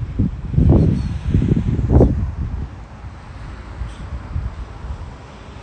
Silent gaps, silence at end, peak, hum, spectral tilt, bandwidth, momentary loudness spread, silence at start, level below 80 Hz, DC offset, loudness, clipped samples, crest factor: none; 0 s; 0 dBFS; none; -10 dB/octave; 8.6 kHz; 21 LU; 0 s; -24 dBFS; under 0.1%; -18 LUFS; under 0.1%; 18 dB